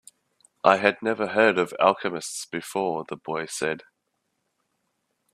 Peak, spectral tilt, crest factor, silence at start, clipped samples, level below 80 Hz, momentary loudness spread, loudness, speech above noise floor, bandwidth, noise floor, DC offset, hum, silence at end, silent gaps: 0 dBFS; -3.5 dB/octave; 26 dB; 0.65 s; under 0.1%; -70 dBFS; 12 LU; -24 LUFS; 53 dB; 14.5 kHz; -77 dBFS; under 0.1%; none; 1.55 s; none